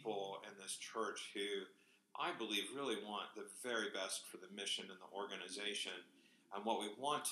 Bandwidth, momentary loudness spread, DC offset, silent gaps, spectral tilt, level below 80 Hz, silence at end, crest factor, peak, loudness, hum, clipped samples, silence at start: 14 kHz; 9 LU; under 0.1%; none; -1.5 dB/octave; under -90 dBFS; 0 s; 20 dB; -24 dBFS; -45 LUFS; none; under 0.1%; 0 s